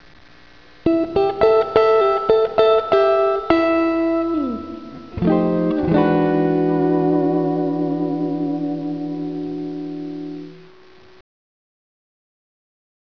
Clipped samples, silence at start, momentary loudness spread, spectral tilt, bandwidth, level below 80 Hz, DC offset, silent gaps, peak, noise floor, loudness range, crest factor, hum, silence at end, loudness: under 0.1%; 0.85 s; 14 LU; -9 dB/octave; 5.4 kHz; -48 dBFS; 0.4%; none; 0 dBFS; -48 dBFS; 14 LU; 20 dB; none; 2.45 s; -18 LUFS